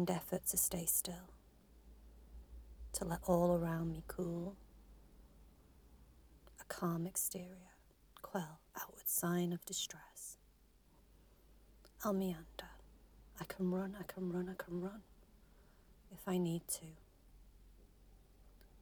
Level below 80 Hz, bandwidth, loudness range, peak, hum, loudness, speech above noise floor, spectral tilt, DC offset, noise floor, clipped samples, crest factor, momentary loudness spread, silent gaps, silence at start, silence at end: -62 dBFS; over 20 kHz; 6 LU; -20 dBFS; none; -40 LUFS; 28 dB; -4.5 dB/octave; under 0.1%; -68 dBFS; under 0.1%; 24 dB; 24 LU; none; 0 s; 0 s